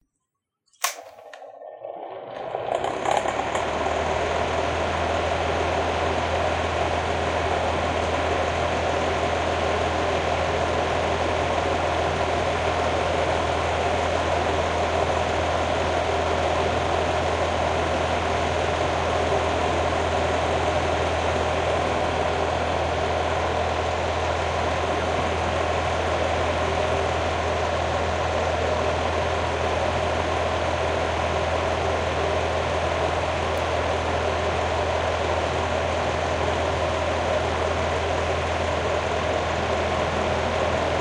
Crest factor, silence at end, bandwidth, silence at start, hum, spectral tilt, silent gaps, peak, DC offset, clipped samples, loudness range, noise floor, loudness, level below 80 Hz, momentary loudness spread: 20 dB; 0 s; 13.5 kHz; 0.8 s; none; -4.5 dB/octave; none; -4 dBFS; under 0.1%; under 0.1%; 1 LU; -81 dBFS; -24 LUFS; -40 dBFS; 1 LU